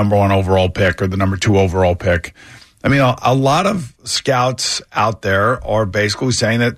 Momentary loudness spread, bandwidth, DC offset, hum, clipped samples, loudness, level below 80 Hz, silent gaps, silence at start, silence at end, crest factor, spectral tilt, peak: 5 LU; 14 kHz; under 0.1%; none; under 0.1%; -16 LUFS; -38 dBFS; none; 0 s; 0 s; 12 dB; -5 dB/octave; -4 dBFS